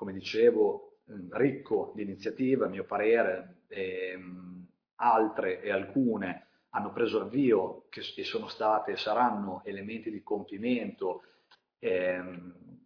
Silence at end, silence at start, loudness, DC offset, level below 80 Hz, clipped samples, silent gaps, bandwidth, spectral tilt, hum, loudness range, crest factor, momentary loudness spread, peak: 0.1 s; 0 s; -31 LUFS; under 0.1%; -76 dBFS; under 0.1%; 4.93-4.97 s; 5.4 kHz; -7 dB/octave; none; 3 LU; 20 dB; 16 LU; -12 dBFS